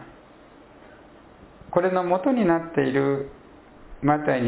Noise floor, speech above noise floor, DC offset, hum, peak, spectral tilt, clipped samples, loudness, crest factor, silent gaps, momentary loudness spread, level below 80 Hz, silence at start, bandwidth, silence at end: -50 dBFS; 28 dB; under 0.1%; none; -6 dBFS; -11 dB/octave; under 0.1%; -23 LUFS; 20 dB; none; 6 LU; -54 dBFS; 0 s; 4 kHz; 0 s